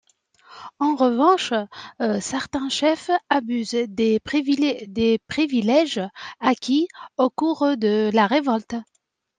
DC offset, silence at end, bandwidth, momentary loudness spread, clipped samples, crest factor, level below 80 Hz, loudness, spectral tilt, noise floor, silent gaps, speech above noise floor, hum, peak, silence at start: under 0.1%; 0.55 s; 9.6 kHz; 8 LU; under 0.1%; 18 dB; -60 dBFS; -21 LUFS; -4.5 dB/octave; -54 dBFS; none; 33 dB; none; -4 dBFS; 0.5 s